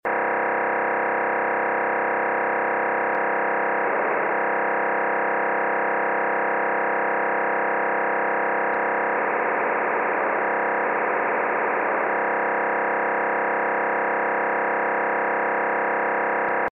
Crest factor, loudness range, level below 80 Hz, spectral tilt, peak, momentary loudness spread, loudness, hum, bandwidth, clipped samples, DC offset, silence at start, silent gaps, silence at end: 10 dB; 0 LU; -78 dBFS; -8 dB/octave; -12 dBFS; 0 LU; -22 LUFS; none; 3.8 kHz; under 0.1%; under 0.1%; 0.05 s; none; 0 s